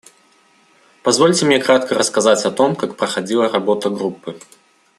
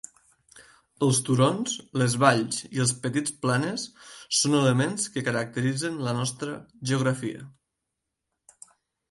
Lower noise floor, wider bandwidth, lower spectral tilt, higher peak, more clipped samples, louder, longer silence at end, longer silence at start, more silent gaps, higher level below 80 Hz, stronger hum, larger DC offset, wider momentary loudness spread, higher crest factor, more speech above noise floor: second, -54 dBFS vs -83 dBFS; first, 13 kHz vs 11.5 kHz; about the same, -3.5 dB/octave vs -4.5 dB/octave; about the same, 0 dBFS vs -2 dBFS; neither; first, -16 LUFS vs -26 LUFS; second, 0.6 s vs 1.6 s; first, 1.05 s vs 0.55 s; neither; about the same, -62 dBFS vs -66 dBFS; neither; neither; second, 11 LU vs 14 LU; second, 16 dB vs 24 dB; second, 38 dB vs 57 dB